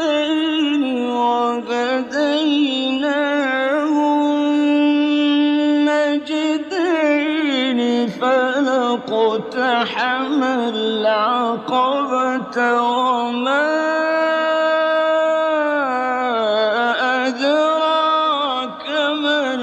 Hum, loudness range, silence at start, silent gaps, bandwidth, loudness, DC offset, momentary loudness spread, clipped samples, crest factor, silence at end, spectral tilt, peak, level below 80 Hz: none; 2 LU; 0 s; none; 8.2 kHz; -18 LUFS; under 0.1%; 4 LU; under 0.1%; 12 dB; 0 s; -4 dB/octave; -6 dBFS; -66 dBFS